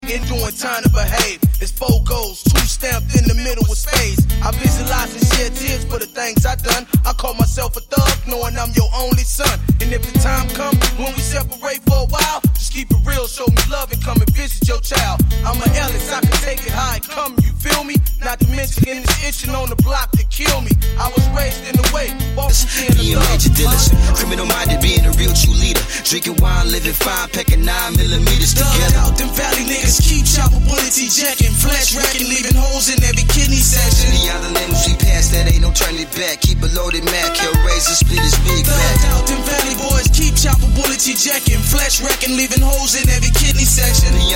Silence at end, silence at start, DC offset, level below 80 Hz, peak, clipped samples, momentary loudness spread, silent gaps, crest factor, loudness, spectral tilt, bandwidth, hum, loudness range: 0 s; 0 s; under 0.1%; -16 dBFS; 0 dBFS; under 0.1%; 7 LU; none; 14 dB; -15 LUFS; -3.5 dB/octave; 17 kHz; none; 4 LU